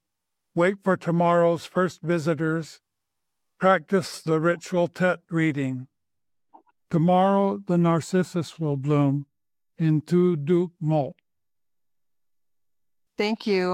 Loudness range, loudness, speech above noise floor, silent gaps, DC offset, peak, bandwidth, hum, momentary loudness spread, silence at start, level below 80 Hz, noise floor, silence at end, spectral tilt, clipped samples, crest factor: 3 LU; -24 LUFS; 66 dB; none; under 0.1%; -8 dBFS; 12.5 kHz; none; 8 LU; 0.55 s; -70 dBFS; -89 dBFS; 0 s; -7 dB/octave; under 0.1%; 18 dB